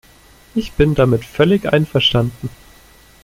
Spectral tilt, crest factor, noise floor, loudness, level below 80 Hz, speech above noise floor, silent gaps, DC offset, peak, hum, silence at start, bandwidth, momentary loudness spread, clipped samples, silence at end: -6.5 dB/octave; 16 dB; -46 dBFS; -16 LUFS; -36 dBFS; 31 dB; none; under 0.1%; -2 dBFS; none; 0.55 s; 16 kHz; 11 LU; under 0.1%; 0.75 s